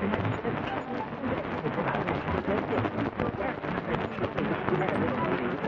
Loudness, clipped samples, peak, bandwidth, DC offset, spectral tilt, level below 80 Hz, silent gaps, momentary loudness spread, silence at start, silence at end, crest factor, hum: -30 LUFS; under 0.1%; -10 dBFS; 7.4 kHz; under 0.1%; -8.5 dB/octave; -52 dBFS; none; 4 LU; 0 s; 0 s; 18 dB; none